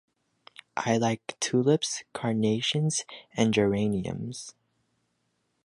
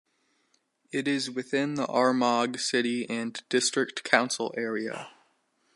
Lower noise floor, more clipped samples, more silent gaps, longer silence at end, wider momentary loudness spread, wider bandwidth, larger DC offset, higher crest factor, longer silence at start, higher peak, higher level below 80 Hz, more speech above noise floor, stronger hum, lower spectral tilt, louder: first, -76 dBFS vs -72 dBFS; neither; neither; first, 1.15 s vs 0.65 s; first, 14 LU vs 9 LU; about the same, 11.5 kHz vs 11.5 kHz; neither; about the same, 20 dB vs 24 dB; second, 0.75 s vs 0.95 s; second, -8 dBFS vs -4 dBFS; first, -60 dBFS vs -82 dBFS; first, 49 dB vs 44 dB; neither; first, -4.5 dB/octave vs -3 dB/octave; about the same, -27 LUFS vs -27 LUFS